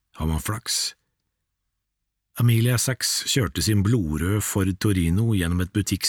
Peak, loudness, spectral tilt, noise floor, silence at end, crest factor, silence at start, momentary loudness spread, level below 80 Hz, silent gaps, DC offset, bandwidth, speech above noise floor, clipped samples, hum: -8 dBFS; -23 LUFS; -4.5 dB/octave; -80 dBFS; 0 s; 14 dB; 0.15 s; 6 LU; -40 dBFS; none; under 0.1%; 18.5 kHz; 57 dB; under 0.1%; none